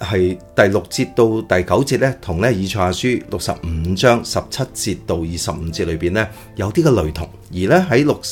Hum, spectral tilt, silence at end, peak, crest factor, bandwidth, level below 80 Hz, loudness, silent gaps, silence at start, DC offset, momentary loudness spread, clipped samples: none; -5.5 dB/octave; 0 s; 0 dBFS; 18 dB; 17 kHz; -36 dBFS; -18 LUFS; none; 0 s; under 0.1%; 8 LU; under 0.1%